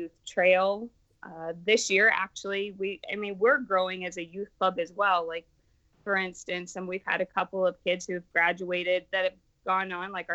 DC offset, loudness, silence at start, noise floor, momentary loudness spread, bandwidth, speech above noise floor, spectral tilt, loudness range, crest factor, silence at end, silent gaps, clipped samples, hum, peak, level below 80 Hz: under 0.1%; -28 LUFS; 0 s; -66 dBFS; 13 LU; 8.4 kHz; 38 dB; -3 dB/octave; 4 LU; 18 dB; 0 s; none; under 0.1%; none; -10 dBFS; -68 dBFS